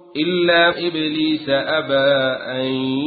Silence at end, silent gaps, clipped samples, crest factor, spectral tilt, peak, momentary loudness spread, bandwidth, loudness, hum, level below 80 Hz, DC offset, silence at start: 0 s; none; under 0.1%; 14 dB; -10 dB/octave; -4 dBFS; 7 LU; 4.8 kHz; -18 LUFS; none; -58 dBFS; under 0.1%; 0.15 s